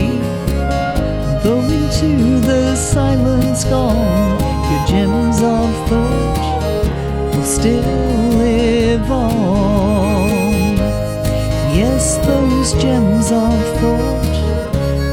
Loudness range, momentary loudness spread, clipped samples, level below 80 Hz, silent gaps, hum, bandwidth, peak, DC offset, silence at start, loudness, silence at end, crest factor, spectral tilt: 1 LU; 4 LU; under 0.1%; -22 dBFS; none; none; 17.5 kHz; 0 dBFS; under 0.1%; 0 s; -15 LUFS; 0 s; 14 dB; -6 dB/octave